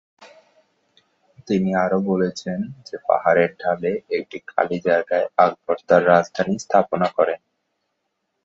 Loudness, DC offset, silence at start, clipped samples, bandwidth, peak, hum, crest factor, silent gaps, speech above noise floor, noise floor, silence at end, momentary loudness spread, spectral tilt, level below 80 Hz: -20 LUFS; under 0.1%; 0.2 s; under 0.1%; 7.8 kHz; -2 dBFS; none; 20 dB; none; 55 dB; -75 dBFS; 1.1 s; 10 LU; -6.5 dB/octave; -62 dBFS